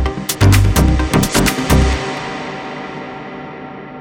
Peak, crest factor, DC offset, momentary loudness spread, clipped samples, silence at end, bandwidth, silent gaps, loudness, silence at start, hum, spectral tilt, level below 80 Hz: 0 dBFS; 16 dB; under 0.1%; 18 LU; under 0.1%; 0 s; 19 kHz; none; -15 LUFS; 0 s; none; -5 dB/octave; -20 dBFS